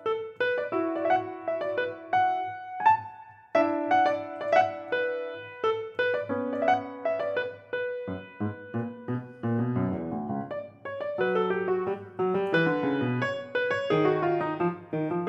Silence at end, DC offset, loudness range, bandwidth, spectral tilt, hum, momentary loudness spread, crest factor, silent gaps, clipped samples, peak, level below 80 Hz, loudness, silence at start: 0 s; under 0.1%; 5 LU; 7.8 kHz; -7.5 dB/octave; none; 10 LU; 20 dB; none; under 0.1%; -8 dBFS; -74 dBFS; -28 LUFS; 0 s